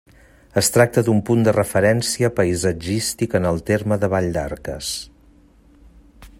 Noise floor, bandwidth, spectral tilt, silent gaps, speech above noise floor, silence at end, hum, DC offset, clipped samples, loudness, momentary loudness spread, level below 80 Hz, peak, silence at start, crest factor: -51 dBFS; 16 kHz; -5 dB/octave; none; 32 dB; 0.1 s; none; under 0.1%; under 0.1%; -19 LUFS; 10 LU; -46 dBFS; 0 dBFS; 0.55 s; 20 dB